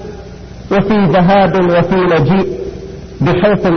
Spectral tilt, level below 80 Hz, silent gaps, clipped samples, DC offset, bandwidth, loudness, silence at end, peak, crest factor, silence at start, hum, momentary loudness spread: -8.5 dB/octave; -32 dBFS; none; under 0.1%; under 0.1%; 6.4 kHz; -11 LUFS; 0 s; 0 dBFS; 12 dB; 0 s; none; 20 LU